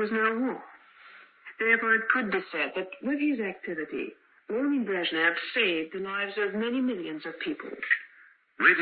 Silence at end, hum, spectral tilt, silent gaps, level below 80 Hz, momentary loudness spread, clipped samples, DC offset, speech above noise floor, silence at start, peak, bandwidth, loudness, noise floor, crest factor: 0 s; none; -8 dB/octave; none; -76 dBFS; 12 LU; under 0.1%; under 0.1%; 29 dB; 0 s; -6 dBFS; 4.9 kHz; -28 LUFS; -58 dBFS; 22 dB